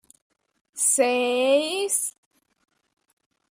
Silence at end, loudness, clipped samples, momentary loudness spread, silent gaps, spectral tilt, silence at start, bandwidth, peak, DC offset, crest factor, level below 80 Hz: 1.4 s; -22 LUFS; under 0.1%; 8 LU; none; 0.5 dB/octave; 0.75 s; 15.5 kHz; -8 dBFS; under 0.1%; 18 dB; -78 dBFS